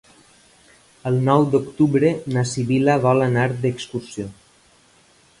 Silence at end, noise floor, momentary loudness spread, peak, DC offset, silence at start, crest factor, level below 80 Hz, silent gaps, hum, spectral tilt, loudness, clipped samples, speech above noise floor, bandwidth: 1.1 s; -55 dBFS; 13 LU; -2 dBFS; under 0.1%; 1.05 s; 18 dB; -56 dBFS; none; none; -7 dB/octave; -19 LUFS; under 0.1%; 36 dB; 11.5 kHz